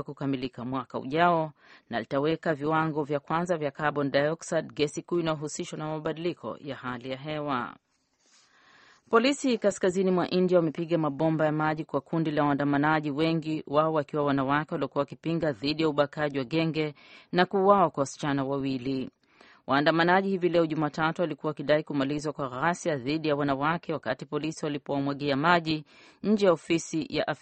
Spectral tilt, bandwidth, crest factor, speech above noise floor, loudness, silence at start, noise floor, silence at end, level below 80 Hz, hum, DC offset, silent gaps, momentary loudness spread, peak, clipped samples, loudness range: -6 dB/octave; 8.4 kHz; 22 dB; 41 dB; -28 LUFS; 0 s; -68 dBFS; 0.05 s; -64 dBFS; none; under 0.1%; none; 10 LU; -6 dBFS; under 0.1%; 5 LU